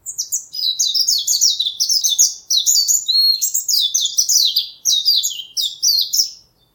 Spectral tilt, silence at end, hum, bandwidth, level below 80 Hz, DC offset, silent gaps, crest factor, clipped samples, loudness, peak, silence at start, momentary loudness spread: 5.5 dB/octave; 0.4 s; none; 19 kHz; -68 dBFS; under 0.1%; none; 18 dB; under 0.1%; -14 LUFS; 0 dBFS; 0.05 s; 8 LU